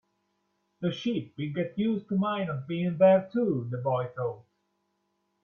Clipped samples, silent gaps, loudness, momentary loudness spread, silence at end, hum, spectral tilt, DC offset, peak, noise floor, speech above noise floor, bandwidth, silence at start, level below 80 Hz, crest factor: under 0.1%; none; -28 LUFS; 13 LU; 1 s; none; -8.5 dB/octave; under 0.1%; -10 dBFS; -76 dBFS; 49 dB; 6.8 kHz; 0.8 s; -70 dBFS; 20 dB